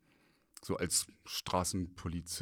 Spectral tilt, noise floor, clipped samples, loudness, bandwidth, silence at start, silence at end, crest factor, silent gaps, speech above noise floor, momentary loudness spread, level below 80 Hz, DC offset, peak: -3 dB/octave; -70 dBFS; under 0.1%; -36 LUFS; over 20 kHz; 0.6 s; 0 s; 20 dB; none; 33 dB; 9 LU; -60 dBFS; under 0.1%; -18 dBFS